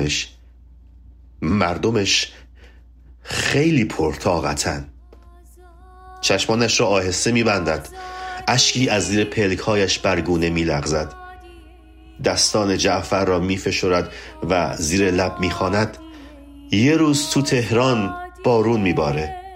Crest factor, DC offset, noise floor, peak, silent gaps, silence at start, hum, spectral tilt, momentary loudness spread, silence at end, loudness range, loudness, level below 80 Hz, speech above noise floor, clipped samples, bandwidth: 18 dB; under 0.1%; -46 dBFS; -4 dBFS; none; 0 s; none; -4 dB/octave; 10 LU; 0 s; 4 LU; -19 LUFS; -42 dBFS; 27 dB; under 0.1%; 16 kHz